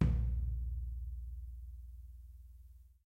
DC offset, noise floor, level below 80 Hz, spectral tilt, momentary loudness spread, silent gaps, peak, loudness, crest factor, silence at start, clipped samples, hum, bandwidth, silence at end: under 0.1%; -58 dBFS; -40 dBFS; -9.5 dB/octave; 21 LU; none; -16 dBFS; -42 LUFS; 22 dB; 0 s; under 0.1%; none; 3.3 kHz; 0.15 s